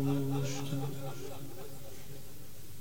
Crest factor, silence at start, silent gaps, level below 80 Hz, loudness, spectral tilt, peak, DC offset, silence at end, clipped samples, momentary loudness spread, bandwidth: 16 dB; 0 s; none; -62 dBFS; -39 LUFS; -6 dB/octave; -20 dBFS; 1%; 0 s; under 0.1%; 16 LU; over 20 kHz